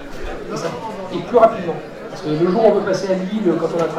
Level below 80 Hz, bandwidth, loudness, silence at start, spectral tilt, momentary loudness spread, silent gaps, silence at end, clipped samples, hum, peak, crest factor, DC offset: -40 dBFS; 12.5 kHz; -18 LUFS; 0 s; -6.5 dB/octave; 15 LU; none; 0 s; under 0.1%; none; 0 dBFS; 18 dB; under 0.1%